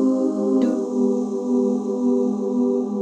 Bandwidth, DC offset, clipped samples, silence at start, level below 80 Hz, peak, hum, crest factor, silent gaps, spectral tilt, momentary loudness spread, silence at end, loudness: 8.4 kHz; under 0.1%; under 0.1%; 0 s; -72 dBFS; -8 dBFS; none; 12 dB; none; -8.5 dB/octave; 2 LU; 0 s; -21 LUFS